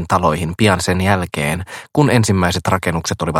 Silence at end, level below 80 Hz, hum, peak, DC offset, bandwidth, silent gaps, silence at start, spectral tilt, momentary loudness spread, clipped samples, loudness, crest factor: 0 s; -38 dBFS; none; 0 dBFS; under 0.1%; 16.5 kHz; none; 0 s; -5 dB/octave; 6 LU; under 0.1%; -16 LUFS; 16 dB